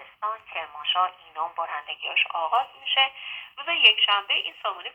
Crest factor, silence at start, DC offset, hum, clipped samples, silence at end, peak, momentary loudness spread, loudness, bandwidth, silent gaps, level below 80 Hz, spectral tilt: 22 dB; 0 s; under 0.1%; none; under 0.1%; 0.05 s; -4 dBFS; 16 LU; -23 LUFS; 8.6 kHz; none; -76 dBFS; -0.5 dB/octave